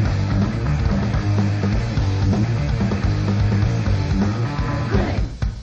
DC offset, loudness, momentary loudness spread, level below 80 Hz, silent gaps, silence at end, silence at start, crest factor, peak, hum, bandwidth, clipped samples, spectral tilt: under 0.1%; -21 LUFS; 3 LU; -26 dBFS; none; 0 s; 0 s; 12 dB; -6 dBFS; none; 7.6 kHz; under 0.1%; -7.5 dB/octave